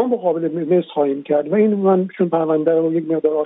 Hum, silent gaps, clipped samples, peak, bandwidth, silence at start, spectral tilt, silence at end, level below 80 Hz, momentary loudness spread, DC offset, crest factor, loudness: none; none; under 0.1%; -4 dBFS; 4 kHz; 0 s; -12 dB/octave; 0 s; -72 dBFS; 4 LU; under 0.1%; 12 dB; -18 LUFS